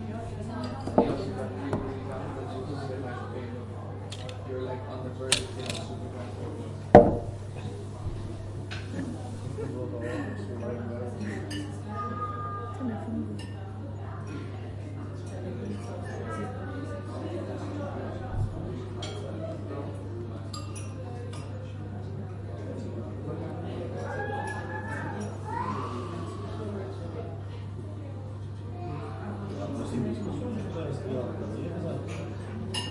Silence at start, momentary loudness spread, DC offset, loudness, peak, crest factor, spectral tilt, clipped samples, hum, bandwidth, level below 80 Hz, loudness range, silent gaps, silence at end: 0 s; 6 LU; under 0.1%; -33 LUFS; 0 dBFS; 32 dB; -6 dB/octave; under 0.1%; none; 11.5 kHz; -50 dBFS; 11 LU; none; 0 s